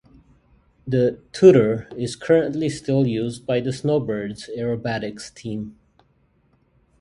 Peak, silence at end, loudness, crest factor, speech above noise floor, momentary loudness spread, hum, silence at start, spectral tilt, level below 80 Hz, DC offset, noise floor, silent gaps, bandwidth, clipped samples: 0 dBFS; 1.3 s; -21 LUFS; 22 dB; 42 dB; 17 LU; none; 0.85 s; -7 dB/octave; -54 dBFS; under 0.1%; -62 dBFS; none; 11 kHz; under 0.1%